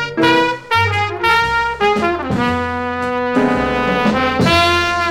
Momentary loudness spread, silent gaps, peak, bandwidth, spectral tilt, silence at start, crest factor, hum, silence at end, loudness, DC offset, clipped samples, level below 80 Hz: 6 LU; none; 0 dBFS; 18 kHz; -5 dB/octave; 0 s; 16 dB; none; 0 s; -15 LUFS; under 0.1%; under 0.1%; -38 dBFS